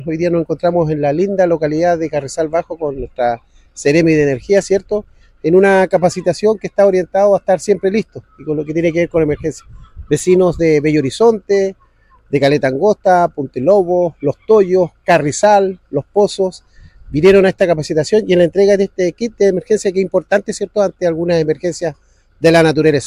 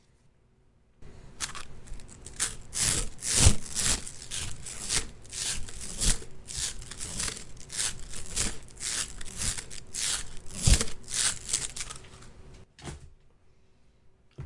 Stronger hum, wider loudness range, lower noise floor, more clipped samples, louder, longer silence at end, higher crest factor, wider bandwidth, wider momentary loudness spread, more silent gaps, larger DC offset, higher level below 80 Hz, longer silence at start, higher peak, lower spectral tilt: neither; about the same, 3 LU vs 5 LU; second, -49 dBFS vs -63 dBFS; neither; first, -14 LUFS vs -30 LUFS; about the same, 0 s vs 0 s; second, 12 dB vs 28 dB; about the same, 11.5 kHz vs 11.5 kHz; second, 9 LU vs 19 LU; neither; neither; about the same, -42 dBFS vs -38 dBFS; second, 0 s vs 1 s; first, 0 dBFS vs -4 dBFS; first, -6 dB/octave vs -2 dB/octave